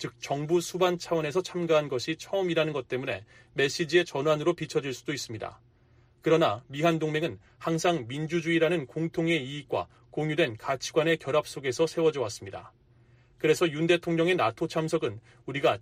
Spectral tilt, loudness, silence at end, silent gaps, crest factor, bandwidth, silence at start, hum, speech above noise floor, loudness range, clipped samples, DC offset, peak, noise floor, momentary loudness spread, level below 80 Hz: -5 dB/octave; -28 LUFS; 0.05 s; none; 18 dB; 15.5 kHz; 0 s; none; 33 dB; 2 LU; under 0.1%; under 0.1%; -10 dBFS; -61 dBFS; 10 LU; -64 dBFS